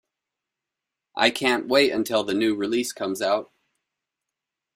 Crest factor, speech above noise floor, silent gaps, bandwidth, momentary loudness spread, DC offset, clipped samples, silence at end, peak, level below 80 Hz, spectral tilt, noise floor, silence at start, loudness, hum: 22 dB; 64 dB; none; 16 kHz; 7 LU; under 0.1%; under 0.1%; 1.3 s; -2 dBFS; -66 dBFS; -3 dB/octave; -86 dBFS; 1.15 s; -23 LUFS; none